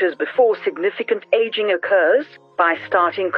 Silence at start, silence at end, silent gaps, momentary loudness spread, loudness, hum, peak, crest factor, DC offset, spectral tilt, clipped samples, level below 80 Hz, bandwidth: 0 s; 0 s; none; 6 LU; -18 LUFS; none; -4 dBFS; 14 dB; under 0.1%; -6 dB/octave; under 0.1%; -72 dBFS; 5.4 kHz